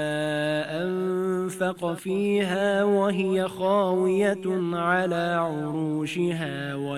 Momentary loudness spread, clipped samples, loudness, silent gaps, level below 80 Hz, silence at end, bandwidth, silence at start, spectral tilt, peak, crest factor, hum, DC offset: 6 LU; under 0.1%; -25 LUFS; none; -68 dBFS; 0 s; 14 kHz; 0 s; -6 dB/octave; -10 dBFS; 16 dB; none; under 0.1%